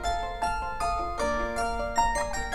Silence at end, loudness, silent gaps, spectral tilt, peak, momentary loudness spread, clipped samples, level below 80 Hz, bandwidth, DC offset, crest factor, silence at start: 0 s; -29 LUFS; none; -3.5 dB/octave; -12 dBFS; 4 LU; under 0.1%; -38 dBFS; 16.5 kHz; under 0.1%; 18 dB; 0 s